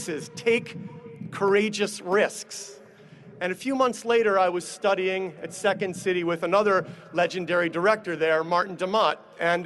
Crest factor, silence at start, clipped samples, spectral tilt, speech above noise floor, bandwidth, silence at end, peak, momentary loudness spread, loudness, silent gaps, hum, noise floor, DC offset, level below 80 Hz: 18 dB; 0 s; under 0.1%; -4 dB/octave; 24 dB; 12.5 kHz; 0 s; -8 dBFS; 12 LU; -25 LUFS; none; none; -49 dBFS; under 0.1%; -70 dBFS